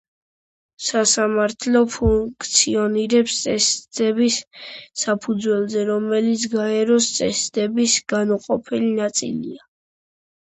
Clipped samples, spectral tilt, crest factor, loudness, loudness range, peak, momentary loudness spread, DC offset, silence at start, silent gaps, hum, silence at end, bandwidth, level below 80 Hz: under 0.1%; -3 dB/octave; 18 dB; -19 LUFS; 3 LU; -2 dBFS; 7 LU; under 0.1%; 0.8 s; none; none; 0.85 s; 9 kHz; -42 dBFS